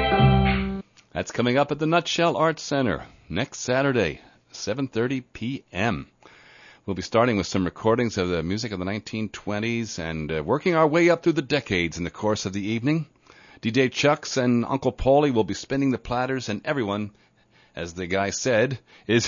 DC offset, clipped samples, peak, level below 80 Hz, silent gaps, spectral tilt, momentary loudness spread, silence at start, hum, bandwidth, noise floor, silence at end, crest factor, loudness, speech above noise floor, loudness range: under 0.1%; under 0.1%; -6 dBFS; -42 dBFS; none; -5.5 dB/octave; 12 LU; 0 s; none; 7.4 kHz; -59 dBFS; 0 s; 18 dB; -24 LUFS; 35 dB; 4 LU